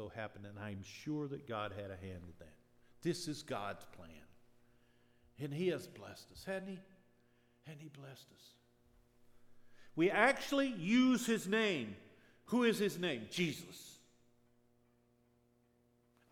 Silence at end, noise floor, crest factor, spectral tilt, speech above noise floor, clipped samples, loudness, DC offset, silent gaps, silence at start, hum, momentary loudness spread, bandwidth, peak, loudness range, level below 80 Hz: 2.35 s; -74 dBFS; 24 dB; -5 dB/octave; 35 dB; under 0.1%; -37 LUFS; under 0.1%; none; 0 s; none; 23 LU; 17.5 kHz; -16 dBFS; 12 LU; -74 dBFS